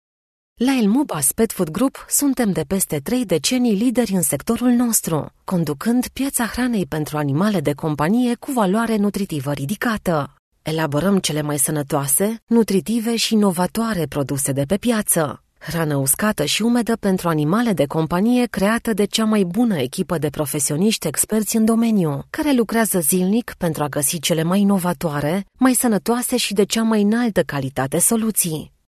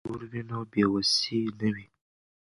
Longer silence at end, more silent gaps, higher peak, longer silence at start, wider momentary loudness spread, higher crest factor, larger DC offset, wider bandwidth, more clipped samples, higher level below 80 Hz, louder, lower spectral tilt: second, 0.2 s vs 0.6 s; first, 10.39-10.52 s, 12.43-12.47 s vs none; first, -2 dBFS vs -10 dBFS; first, 0.6 s vs 0.05 s; second, 6 LU vs 13 LU; about the same, 18 dB vs 20 dB; neither; first, 14 kHz vs 11.5 kHz; neither; first, -48 dBFS vs -62 dBFS; first, -19 LUFS vs -28 LUFS; about the same, -4.5 dB/octave vs -4.5 dB/octave